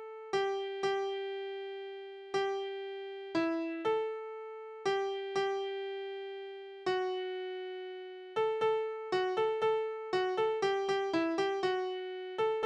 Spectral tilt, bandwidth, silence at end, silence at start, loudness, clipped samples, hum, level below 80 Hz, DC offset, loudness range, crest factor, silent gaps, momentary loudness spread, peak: -4.5 dB/octave; 9.2 kHz; 0 s; 0 s; -35 LUFS; under 0.1%; none; -78 dBFS; under 0.1%; 4 LU; 16 dB; none; 11 LU; -20 dBFS